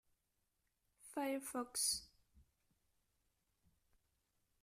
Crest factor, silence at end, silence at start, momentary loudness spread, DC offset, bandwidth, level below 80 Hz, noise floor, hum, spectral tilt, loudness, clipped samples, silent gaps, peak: 24 dB; 2.2 s; 1.05 s; 7 LU; under 0.1%; 15.5 kHz; -78 dBFS; -86 dBFS; none; -0.5 dB/octave; -41 LUFS; under 0.1%; none; -26 dBFS